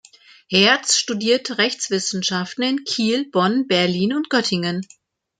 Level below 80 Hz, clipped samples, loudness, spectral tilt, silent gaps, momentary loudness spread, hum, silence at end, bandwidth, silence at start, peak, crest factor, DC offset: -64 dBFS; under 0.1%; -19 LUFS; -3 dB/octave; none; 7 LU; none; 0.55 s; 9.6 kHz; 0.5 s; -2 dBFS; 20 dB; under 0.1%